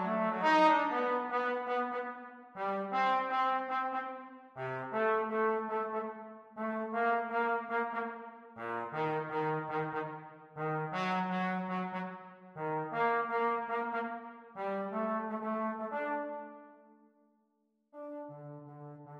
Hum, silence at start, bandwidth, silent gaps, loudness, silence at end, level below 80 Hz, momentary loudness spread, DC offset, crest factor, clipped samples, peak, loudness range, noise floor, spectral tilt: none; 0 s; 8.6 kHz; none; -34 LUFS; 0 s; -86 dBFS; 17 LU; under 0.1%; 18 dB; under 0.1%; -16 dBFS; 5 LU; -77 dBFS; -7 dB/octave